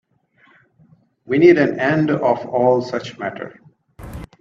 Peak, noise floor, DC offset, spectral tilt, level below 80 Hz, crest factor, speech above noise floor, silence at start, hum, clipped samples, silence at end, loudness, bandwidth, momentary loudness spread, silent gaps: 0 dBFS; -56 dBFS; under 0.1%; -7.5 dB/octave; -50 dBFS; 20 dB; 40 dB; 1.3 s; none; under 0.1%; 0.15 s; -17 LUFS; 7.2 kHz; 23 LU; none